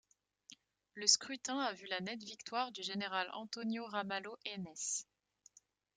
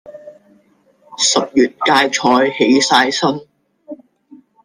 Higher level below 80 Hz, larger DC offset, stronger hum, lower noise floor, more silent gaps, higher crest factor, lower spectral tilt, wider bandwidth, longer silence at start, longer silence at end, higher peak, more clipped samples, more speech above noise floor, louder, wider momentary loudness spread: second, -86 dBFS vs -60 dBFS; neither; neither; first, -68 dBFS vs -55 dBFS; neither; first, 28 dB vs 16 dB; about the same, -1.5 dB/octave vs -2.5 dB/octave; second, 11 kHz vs 14 kHz; first, 0.5 s vs 0.05 s; first, 0.95 s vs 0.7 s; second, -14 dBFS vs 0 dBFS; neither; second, 28 dB vs 41 dB; second, -38 LUFS vs -13 LUFS; first, 14 LU vs 7 LU